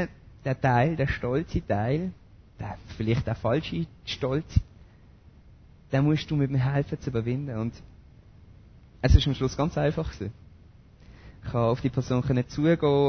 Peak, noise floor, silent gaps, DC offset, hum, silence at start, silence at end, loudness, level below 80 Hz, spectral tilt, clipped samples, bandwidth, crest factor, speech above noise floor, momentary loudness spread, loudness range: -4 dBFS; -53 dBFS; none; under 0.1%; none; 0 s; 0 s; -27 LUFS; -36 dBFS; -7.5 dB/octave; under 0.1%; 6.6 kHz; 22 dB; 27 dB; 12 LU; 2 LU